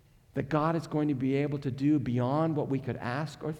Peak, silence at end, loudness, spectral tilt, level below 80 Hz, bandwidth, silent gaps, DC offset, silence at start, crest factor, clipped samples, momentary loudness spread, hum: -16 dBFS; 0 s; -30 LUFS; -8.5 dB/octave; -60 dBFS; 10.5 kHz; none; under 0.1%; 0.35 s; 14 dB; under 0.1%; 6 LU; none